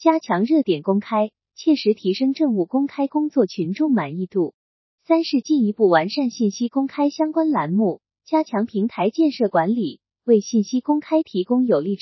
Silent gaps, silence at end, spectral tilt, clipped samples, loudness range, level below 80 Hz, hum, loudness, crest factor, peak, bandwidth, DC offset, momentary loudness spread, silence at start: 4.54-4.98 s; 0.05 s; -6.5 dB/octave; under 0.1%; 1 LU; -76 dBFS; none; -21 LUFS; 18 dB; -2 dBFS; 6.2 kHz; under 0.1%; 5 LU; 0 s